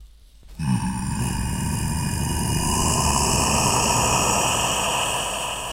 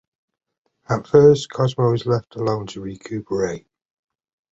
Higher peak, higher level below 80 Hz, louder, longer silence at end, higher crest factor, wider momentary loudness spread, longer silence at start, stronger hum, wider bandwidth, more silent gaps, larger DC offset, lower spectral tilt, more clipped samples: second, -6 dBFS vs -2 dBFS; first, -32 dBFS vs -52 dBFS; about the same, -21 LUFS vs -19 LUFS; second, 0 s vs 0.95 s; about the same, 16 dB vs 20 dB; second, 7 LU vs 18 LU; second, 0 s vs 0.9 s; neither; first, 16 kHz vs 8 kHz; neither; neither; second, -3 dB/octave vs -7 dB/octave; neither